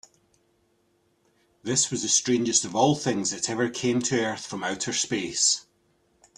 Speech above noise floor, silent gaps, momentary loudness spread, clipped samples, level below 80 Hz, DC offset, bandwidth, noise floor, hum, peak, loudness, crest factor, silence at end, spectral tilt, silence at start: 43 dB; none; 8 LU; under 0.1%; -64 dBFS; under 0.1%; 12 kHz; -68 dBFS; none; -6 dBFS; -24 LUFS; 20 dB; 0.75 s; -2.5 dB/octave; 1.65 s